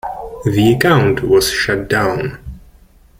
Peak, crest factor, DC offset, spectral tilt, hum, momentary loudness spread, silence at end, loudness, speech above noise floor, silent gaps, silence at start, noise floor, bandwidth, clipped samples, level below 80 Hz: 0 dBFS; 14 dB; under 0.1%; -5.5 dB/octave; none; 13 LU; 0.6 s; -14 LUFS; 32 dB; none; 0.05 s; -46 dBFS; 16.5 kHz; under 0.1%; -36 dBFS